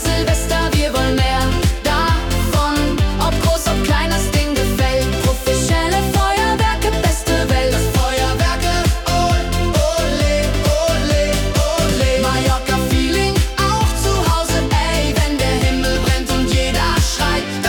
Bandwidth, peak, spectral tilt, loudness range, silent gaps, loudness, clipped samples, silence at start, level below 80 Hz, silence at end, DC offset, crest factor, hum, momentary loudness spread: 18 kHz; -4 dBFS; -4.5 dB/octave; 0 LU; none; -16 LUFS; under 0.1%; 0 s; -22 dBFS; 0 s; under 0.1%; 12 dB; none; 2 LU